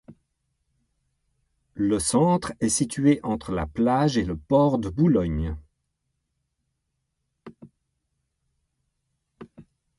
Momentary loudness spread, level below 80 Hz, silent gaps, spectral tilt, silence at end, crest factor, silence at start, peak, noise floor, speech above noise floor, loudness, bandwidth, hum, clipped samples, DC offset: 9 LU; -44 dBFS; none; -6 dB/octave; 0.35 s; 20 dB; 0.1 s; -8 dBFS; -78 dBFS; 56 dB; -23 LUFS; 11.5 kHz; none; under 0.1%; under 0.1%